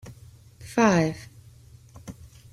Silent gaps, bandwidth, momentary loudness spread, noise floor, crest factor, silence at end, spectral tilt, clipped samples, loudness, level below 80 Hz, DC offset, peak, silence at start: none; 15 kHz; 26 LU; -50 dBFS; 22 dB; 0.4 s; -6 dB/octave; under 0.1%; -23 LUFS; -56 dBFS; under 0.1%; -6 dBFS; 0.05 s